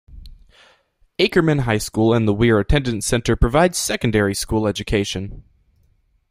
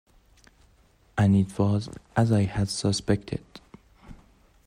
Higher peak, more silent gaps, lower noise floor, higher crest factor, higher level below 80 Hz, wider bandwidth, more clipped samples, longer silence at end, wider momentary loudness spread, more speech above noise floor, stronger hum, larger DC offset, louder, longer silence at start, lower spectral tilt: first, 0 dBFS vs -10 dBFS; neither; about the same, -60 dBFS vs -60 dBFS; about the same, 18 dB vs 18 dB; first, -32 dBFS vs -50 dBFS; first, 16 kHz vs 11 kHz; neither; first, 0.9 s vs 0.5 s; second, 5 LU vs 11 LU; first, 42 dB vs 36 dB; neither; neither; first, -19 LUFS vs -26 LUFS; second, 0.1 s vs 1.15 s; second, -5 dB/octave vs -6.5 dB/octave